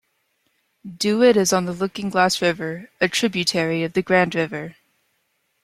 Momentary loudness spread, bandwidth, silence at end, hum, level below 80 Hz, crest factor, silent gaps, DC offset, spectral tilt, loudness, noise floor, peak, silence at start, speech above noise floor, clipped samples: 12 LU; 15.5 kHz; 0.95 s; none; -60 dBFS; 20 dB; none; under 0.1%; -4 dB/octave; -20 LUFS; -70 dBFS; -2 dBFS; 0.85 s; 50 dB; under 0.1%